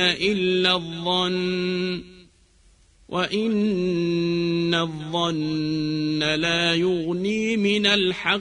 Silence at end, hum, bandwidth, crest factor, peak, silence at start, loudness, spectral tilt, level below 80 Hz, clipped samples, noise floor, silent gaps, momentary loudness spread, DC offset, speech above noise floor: 0 s; none; 10.5 kHz; 18 dB; -6 dBFS; 0 s; -22 LUFS; -5 dB/octave; -54 dBFS; under 0.1%; -57 dBFS; none; 5 LU; under 0.1%; 34 dB